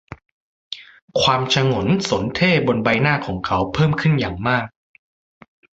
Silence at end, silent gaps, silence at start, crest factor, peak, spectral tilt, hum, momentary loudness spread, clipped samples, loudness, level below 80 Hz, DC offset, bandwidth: 1.1 s; 0.32-0.71 s, 1.02-1.08 s; 0.1 s; 18 dB; -2 dBFS; -5.5 dB/octave; none; 16 LU; under 0.1%; -18 LUFS; -44 dBFS; under 0.1%; 8 kHz